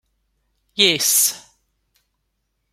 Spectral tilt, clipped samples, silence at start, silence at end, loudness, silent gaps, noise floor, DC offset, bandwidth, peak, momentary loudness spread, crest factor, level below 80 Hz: 0 dB/octave; under 0.1%; 0.75 s; 1.35 s; -15 LUFS; none; -73 dBFS; under 0.1%; 16.5 kHz; 0 dBFS; 18 LU; 22 dB; -66 dBFS